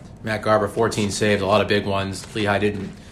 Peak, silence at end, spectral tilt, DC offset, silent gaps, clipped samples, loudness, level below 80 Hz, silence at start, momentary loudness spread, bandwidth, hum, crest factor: -6 dBFS; 0 s; -5 dB/octave; under 0.1%; none; under 0.1%; -21 LUFS; -48 dBFS; 0 s; 8 LU; 14 kHz; none; 16 dB